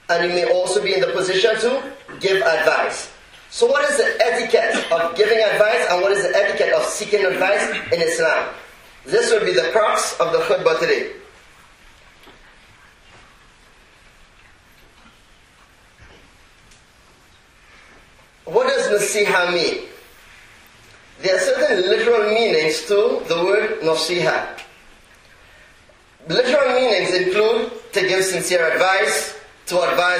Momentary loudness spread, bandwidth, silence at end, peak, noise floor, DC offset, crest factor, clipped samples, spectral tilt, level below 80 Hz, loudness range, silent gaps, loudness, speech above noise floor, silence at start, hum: 7 LU; 15.5 kHz; 0 s; 0 dBFS; -51 dBFS; under 0.1%; 18 dB; under 0.1%; -2.5 dB/octave; -56 dBFS; 5 LU; none; -18 LUFS; 33 dB; 0.1 s; none